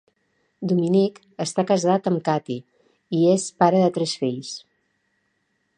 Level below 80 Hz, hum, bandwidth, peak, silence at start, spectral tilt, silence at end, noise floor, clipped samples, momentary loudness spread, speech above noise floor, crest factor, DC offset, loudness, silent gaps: -72 dBFS; none; 10 kHz; -2 dBFS; 0.6 s; -6 dB/octave; 1.2 s; -71 dBFS; under 0.1%; 13 LU; 50 dB; 20 dB; under 0.1%; -22 LUFS; none